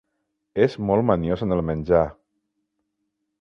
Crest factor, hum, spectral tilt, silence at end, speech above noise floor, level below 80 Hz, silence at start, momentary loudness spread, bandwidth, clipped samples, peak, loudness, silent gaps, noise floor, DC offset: 20 dB; none; -9 dB/octave; 1.3 s; 56 dB; -44 dBFS; 0.55 s; 5 LU; 6.8 kHz; under 0.1%; -4 dBFS; -22 LUFS; none; -77 dBFS; under 0.1%